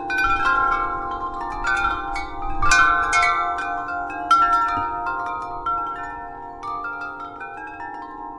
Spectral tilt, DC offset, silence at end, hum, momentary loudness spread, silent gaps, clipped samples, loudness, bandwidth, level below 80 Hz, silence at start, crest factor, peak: -2.5 dB/octave; under 0.1%; 0 s; none; 17 LU; none; under 0.1%; -21 LUFS; 12 kHz; -36 dBFS; 0 s; 20 dB; -2 dBFS